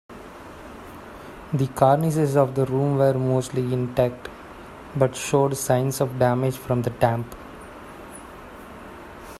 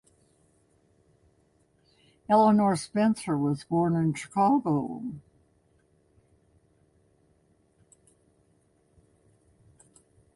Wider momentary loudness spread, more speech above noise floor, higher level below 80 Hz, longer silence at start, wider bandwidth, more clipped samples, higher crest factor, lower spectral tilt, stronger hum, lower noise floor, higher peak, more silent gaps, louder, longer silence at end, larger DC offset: first, 21 LU vs 16 LU; second, 20 dB vs 42 dB; first, -50 dBFS vs -66 dBFS; second, 0.1 s vs 2.3 s; first, 14.5 kHz vs 11.5 kHz; neither; about the same, 20 dB vs 20 dB; about the same, -6.5 dB/octave vs -7 dB/octave; neither; second, -41 dBFS vs -67 dBFS; first, -4 dBFS vs -10 dBFS; neither; first, -22 LUFS vs -26 LUFS; second, 0 s vs 5.15 s; neither